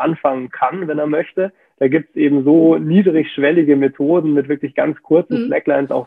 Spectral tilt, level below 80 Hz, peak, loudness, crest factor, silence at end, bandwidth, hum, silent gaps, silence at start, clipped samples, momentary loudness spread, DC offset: -10 dB/octave; -64 dBFS; -2 dBFS; -16 LUFS; 14 dB; 0 s; 3.9 kHz; none; none; 0 s; under 0.1%; 8 LU; under 0.1%